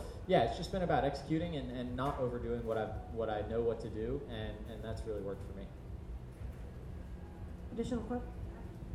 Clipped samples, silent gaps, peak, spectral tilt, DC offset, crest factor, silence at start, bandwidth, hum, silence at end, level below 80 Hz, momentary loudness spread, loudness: under 0.1%; none; -16 dBFS; -7 dB/octave; under 0.1%; 22 dB; 0 s; 13.5 kHz; none; 0 s; -48 dBFS; 15 LU; -39 LUFS